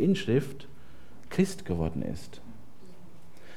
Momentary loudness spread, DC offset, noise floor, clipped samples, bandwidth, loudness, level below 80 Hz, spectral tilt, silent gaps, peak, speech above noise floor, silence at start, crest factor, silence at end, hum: 24 LU; 1%; -53 dBFS; under 0.1%; 15 kHz; -30 LUFS; -52 dBFS; -6.5 dB/octave; none; -12 dBFS; 24 dB; 0 s; 20 dB; 0 s; none